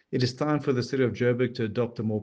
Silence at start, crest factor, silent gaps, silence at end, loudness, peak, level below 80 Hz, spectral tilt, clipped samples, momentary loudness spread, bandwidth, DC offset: 0.1 s; 16 dB; none; 0 s; -27 LUFS; -12 dBFS; -64 dBFS; -7 dB/octave; under 0.1%; 4 LU; 8.6 kHz; under 0.1%